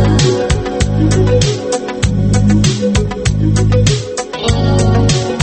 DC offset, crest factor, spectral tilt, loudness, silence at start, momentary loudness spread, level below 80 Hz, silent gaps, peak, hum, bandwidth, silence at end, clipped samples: under 0.1%; 12 dB; -5.5 dB/octave; -13 LUFS; 0 s; 5 LU; -22 dBFS; none; 0 dBFS; none; 8.8 kHz; 0 s; under 0.1%